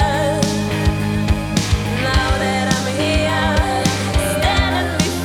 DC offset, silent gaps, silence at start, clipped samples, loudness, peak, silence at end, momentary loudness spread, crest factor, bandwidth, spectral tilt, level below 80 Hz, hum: under 0.1%; none; 0 s; under 0.1%; -17 LUFS; -2 dBFS; 0 s; 2 LU; 16 dB; 17.5 kHz; -4.5 dB/octave; -24 dBFS; none